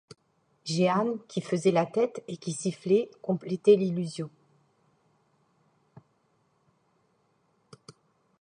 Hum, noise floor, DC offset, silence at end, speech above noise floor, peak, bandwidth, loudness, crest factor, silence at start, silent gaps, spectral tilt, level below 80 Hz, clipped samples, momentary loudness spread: none; -70 dBFS; under 0.1%; 4.15 s; 44 dB; -8 dBFS; 10.5 kHz; -28 LUFS; 22 dB; 0.65 s; none; -6 dB/octave; -76 dBFS; under 0.1%; 13 LU